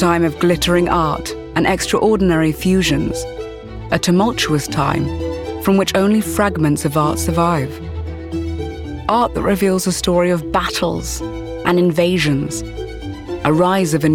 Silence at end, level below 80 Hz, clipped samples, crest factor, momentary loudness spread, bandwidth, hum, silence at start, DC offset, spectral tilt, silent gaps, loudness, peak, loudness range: 0 s; -34 dBFS; under 0.1%; 14 dB; 12 LU; 17.5 kHz; none; 0 s; 0.1%; -5.5 dB/octave; none; -17 LUFS; -2 dBFS; 2 LU